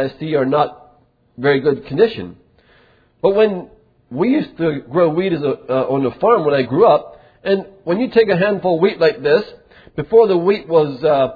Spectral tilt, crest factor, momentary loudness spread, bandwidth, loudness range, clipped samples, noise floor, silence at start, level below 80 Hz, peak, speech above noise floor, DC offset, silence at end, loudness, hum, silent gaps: -9 dB/octave; 16 dB; 8 LU; 5 kHz; 4 LU; under 0.1%; -53 dBFS; 0 s; -54 dBFS; 0 dBFS; 38 dB; under 0.1%; 0 s; -16 LUFS; none; none